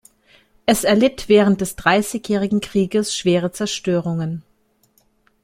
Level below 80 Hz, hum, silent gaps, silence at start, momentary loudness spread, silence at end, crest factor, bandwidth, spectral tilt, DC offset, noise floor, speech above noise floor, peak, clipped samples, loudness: -48 dBFS; none; none; 0.65 s; 9 LU; 1.05 s; 18 dB; 16.5 kHz; -5 dB/octave; under 0.1%; -61 dBFS; 43 dB; -2 dBFS; under 0.1%; -18 LUFS